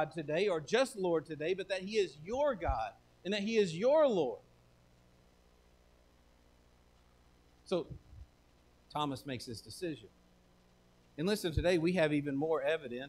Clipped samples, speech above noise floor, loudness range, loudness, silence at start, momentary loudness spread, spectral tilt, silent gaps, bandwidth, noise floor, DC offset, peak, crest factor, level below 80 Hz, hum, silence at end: under 0.1%; 32 dB; 13 LU; -34 LUFS; 0 s; 13 LU; -5.5 dB/octave; none; 15.5 kHz; -66 dBFS; under 0.1%; -18 dBFS; 18 dB; -54 dBFS; 60 Hz at -65 dBFS; 0 s